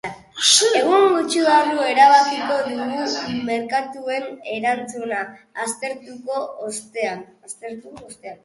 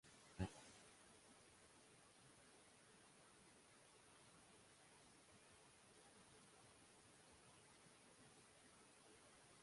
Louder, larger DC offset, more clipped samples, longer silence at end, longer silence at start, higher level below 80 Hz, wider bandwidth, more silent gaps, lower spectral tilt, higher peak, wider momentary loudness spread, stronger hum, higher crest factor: first, -19 LUFS vs -64 LUFS; neither; neither; about the same, 0.1 s vs 0 s; about the same, 0.05 s vs 0.05 s; first, -66 dBFS vs -76 dBFS; about the same, 11.5 kHz vs 11.5 kHz; neither; second, -1.5 dB/octave vs -4.5 dB/octave; first, -2 dBFS vs -34 dBFS; first, 20 LU vs 4 LU; neither; second, 20 dB vs 32 dB